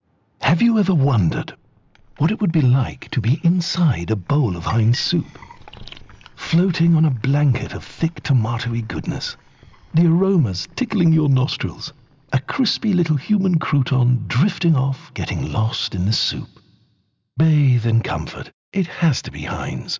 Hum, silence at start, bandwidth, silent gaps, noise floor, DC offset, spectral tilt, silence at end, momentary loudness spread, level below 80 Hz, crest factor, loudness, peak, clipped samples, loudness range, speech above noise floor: none; 0.4 s; 7.6 kHz; 18.53-18.72 s; -65 dBFS; under 0.1%; -6.5 dB/octave; 0 s; 11 LU; -42 dBFS; 10 dB; -19 LUFS; -10 dBFS; under 0.1%; 2 LU; 47 dB